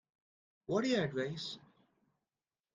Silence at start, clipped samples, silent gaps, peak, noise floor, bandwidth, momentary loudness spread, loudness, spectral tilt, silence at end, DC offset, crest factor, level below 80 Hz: 0.7 s; under 0.1%; none; -20 dBFS; under -90 dBFS; 9.4 kHz; 17 LU; -36 LUFS; -5.5 dB/octave; 1.15 s; under 0.1%; 20 dB; -76 dBFS